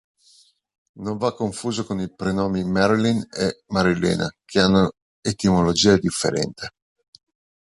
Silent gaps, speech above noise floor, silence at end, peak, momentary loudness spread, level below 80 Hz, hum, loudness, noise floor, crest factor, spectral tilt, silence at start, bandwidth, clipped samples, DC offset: 5.02-5.23 s; 36 dB; 1.05 s; -2 dBFS; 11 LU; -46 dBFS; none; -21 LUFS; -56 dBFS; 20 dB; -5 dB/octave; 0.95 s; 11.5 kHz; under 0.1%; under 0.1%